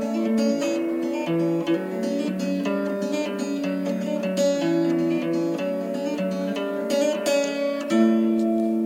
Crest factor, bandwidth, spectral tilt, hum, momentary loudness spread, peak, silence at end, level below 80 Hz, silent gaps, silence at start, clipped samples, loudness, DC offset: 14 dB; 16.5 kHz; -5.5 dB/octave; none; 5 LU; -10 dBFS; 0 s; -74 dBFS; none; 0 s; under 0.1%; -24 LUFS; under 0.1%